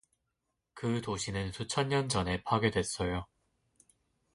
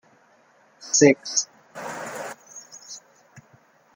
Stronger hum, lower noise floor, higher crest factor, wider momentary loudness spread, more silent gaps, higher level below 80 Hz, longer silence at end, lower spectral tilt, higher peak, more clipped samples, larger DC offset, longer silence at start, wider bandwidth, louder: neither; first, -84 dBFS vs -58 dBFS; about the same, 20 dB vs 24 dB; second, 8 LU vs 24 LU; neither; first, -52 dBFS vs -70 dBFS; first, 1.1 s vs 0.55 s; first, -4.5 dB/octave vs -3 dB/octave; second, -14 dBFS vs -2 dBFS; neither; neither; about the same, 0.75 s vs 0.8 s; second, 11.5 kHz vs 16.5 kHz; second, -33 LUFS vs -22 LUFS